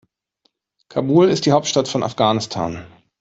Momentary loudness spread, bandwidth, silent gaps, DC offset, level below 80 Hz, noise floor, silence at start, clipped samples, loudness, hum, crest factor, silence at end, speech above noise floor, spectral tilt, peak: 12 LU; 8 kHz; none; under 0.1%; -56 dBFS; -67 dBFS; 0.95 s; under 0.1%; -18 LUFS; none; 16 dB; 0.35 s; 50 dB; -5.5 dB/octave; -2 dBFS